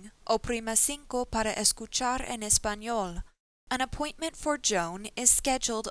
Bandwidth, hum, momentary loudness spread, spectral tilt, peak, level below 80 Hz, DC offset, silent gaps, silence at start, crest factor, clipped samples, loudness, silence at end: 11 kHz; none; 10 LU; -1.5 dB/octave; -6 dBFS; -46 dBFS; under 0.1%; 3.40-3.67 s; 0 s; 22 dB; under 0.1%; -28 LUFS; 0 s